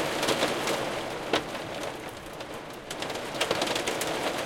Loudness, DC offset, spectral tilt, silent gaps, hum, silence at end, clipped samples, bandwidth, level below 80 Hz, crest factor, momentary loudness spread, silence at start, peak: -30 LUFS; under 0.1%; -2.5 dB/octave; none; none; 0 s; under 0.1%; 17 kHz; -58 dBFS; 20 dB; 12 LU; 0 s; -10 dBFS